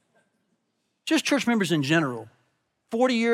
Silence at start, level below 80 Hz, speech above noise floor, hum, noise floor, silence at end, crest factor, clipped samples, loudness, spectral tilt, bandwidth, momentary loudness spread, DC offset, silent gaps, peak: 1.05 s; -82 dBFS; 52 dB; none; -76 dBFS; 0 s; 16 dB; under 0.1%; -24 LUFS; -4.5 dB/octave; 16 kHz; 12 LU; under 0.1%; none; -10 dBFS